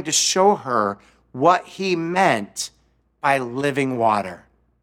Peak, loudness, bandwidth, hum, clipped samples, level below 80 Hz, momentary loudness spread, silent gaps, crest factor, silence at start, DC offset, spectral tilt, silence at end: -2 dBFS; -20 LUFS; 17 kHz; none; under 0.1%; -64 dBFS; 12 LU; none; 20 dB; 0 s; under 0.1%; -3 dB/octave; 0.45 s